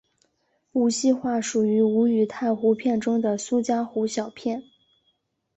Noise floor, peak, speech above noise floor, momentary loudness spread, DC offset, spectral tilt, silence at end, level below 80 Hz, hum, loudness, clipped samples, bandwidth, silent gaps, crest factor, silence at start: -71 dBFS; -10 dBFS; 49 dB; 9 LU; under 0.1%; -5 dB/octave; 0.95 s; -68 dBFS; none; -24 LUFS; under 0.1%; 8.2 kHz; none; 14 dB; 0.75 s